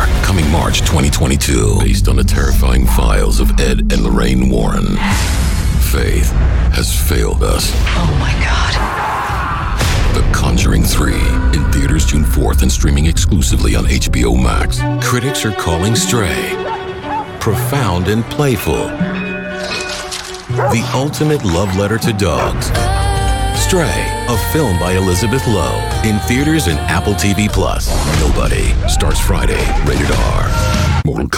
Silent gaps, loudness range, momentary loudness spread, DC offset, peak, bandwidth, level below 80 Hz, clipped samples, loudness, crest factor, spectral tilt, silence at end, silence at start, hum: none; 3 LU; 4 LU; under 0.1%; -2 dBFS; 18 kHz; -16 dBFS; under 0.1%; -14 LUFS; 12 dB; -5 dB/octave; 0 s; 0 s; none